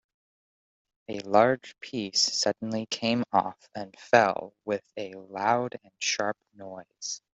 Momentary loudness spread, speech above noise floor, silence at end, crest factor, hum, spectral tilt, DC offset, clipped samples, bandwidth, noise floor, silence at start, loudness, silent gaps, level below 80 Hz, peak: 18 LU; over 62 dB; 0.25 s; 26 dB; none; -3 dB/octave; under 0.1%; under 0.1%; 8.2 kHz; under -90 dBFS; 1.1 s; -27 LUFS; none; -72 dBFS; -4 dBFS